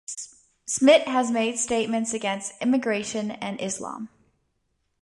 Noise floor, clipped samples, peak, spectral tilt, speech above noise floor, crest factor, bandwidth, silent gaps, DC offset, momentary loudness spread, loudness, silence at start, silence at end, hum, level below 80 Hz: -74 dBFS; under 0.1%; -6 dBFS; -3 dB/octave; 50 dB; 20 dB; 11.5 kHz; none; under 0.1%; 19 LU; -24 LUFS; 0.1 s; 0.95 s; none; -66 dBFS